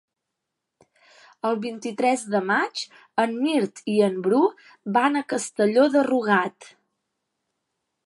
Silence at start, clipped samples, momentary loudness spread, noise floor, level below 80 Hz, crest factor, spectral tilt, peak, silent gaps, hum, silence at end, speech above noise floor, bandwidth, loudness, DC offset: 1.45 s; under 0.1%; 10 LU; -82 dBFS; -78 dBFS; 20 dB; -4.5 dB/octave; -4 dBFS; none; none; 1.4 s; 60 dB; 11.5 kHz; -23 LUFS; under 0.1%